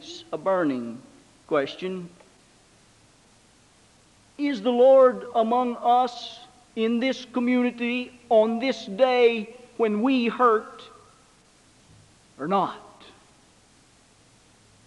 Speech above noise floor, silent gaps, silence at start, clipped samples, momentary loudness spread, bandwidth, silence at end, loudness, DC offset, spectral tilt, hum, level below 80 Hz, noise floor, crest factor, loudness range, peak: 35 dB; none; 0 s; under 0.1%; 19 LU; 10.5 kHz; 2.1 s; -23 LUFS; under 0.1%; -5.5 dB/octave; none; -68 dBFS; -57 dBFS; 18 dB; 12 LU; -6 dBFS